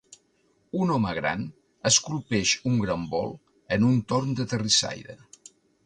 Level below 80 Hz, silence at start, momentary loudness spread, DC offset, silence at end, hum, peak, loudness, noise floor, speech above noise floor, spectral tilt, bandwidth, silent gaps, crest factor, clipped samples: -54 dBFS; 0.75 s; 13 LU; under 0.1%; 0.7 s; none; -6 dBFS; -25 LUFS; -67 dBFS; 42 dB; -3.5 dB/octave; 11 kHz; none; 22 dB; under 0.1%